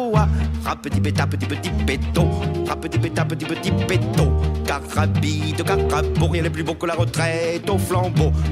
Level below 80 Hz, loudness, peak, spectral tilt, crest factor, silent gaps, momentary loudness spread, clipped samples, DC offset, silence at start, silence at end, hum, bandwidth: -30 dBFS; -21 LUFS; -4 dBFS; -6 dB/octave; 16 dB; none; 5 LU; under 0.1%; under 0.1%; 0 s; 0 s; none; 15.5 kHz